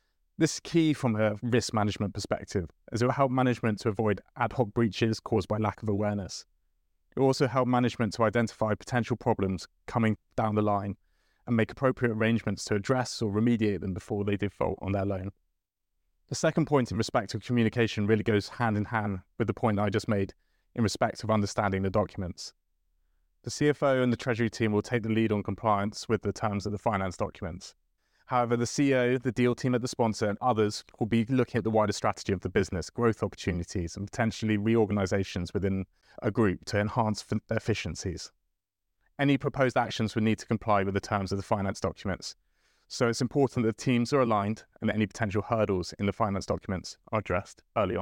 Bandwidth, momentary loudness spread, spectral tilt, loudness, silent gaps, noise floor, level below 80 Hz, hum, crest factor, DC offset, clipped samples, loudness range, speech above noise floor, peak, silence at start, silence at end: 15.5 kHz; 9 LU; -6 dB/octave; -29 LUFS; none; -84 dBFS; -56 dBFS; none; 18 dB; under 0.1%; under 0.1%; 3 LU; 55 dB; -10 dBFS; 0.4 s; 0 s